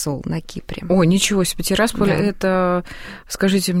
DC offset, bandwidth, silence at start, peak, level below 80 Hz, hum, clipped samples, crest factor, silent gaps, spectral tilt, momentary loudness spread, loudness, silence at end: under 0.1%; 16 kHz; 0 s; -4 dBFS; -38 dBFS; none; under 0.1%; 16 dB; none; -5 dB/octave; 15 LU; -18 LUFS; 0 s